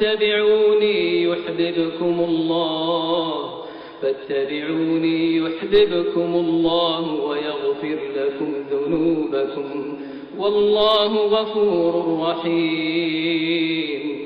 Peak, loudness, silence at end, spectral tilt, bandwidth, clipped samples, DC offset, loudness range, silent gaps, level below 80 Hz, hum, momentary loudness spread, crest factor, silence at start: -6 dBFS; -20 LUFS; 0 s; -3 dB/octave; 5.2 kHz; under 0.1%; under 0.1%; 3 LU; none; -54 dBFS; none; 9 LU; 14 dB; 0 s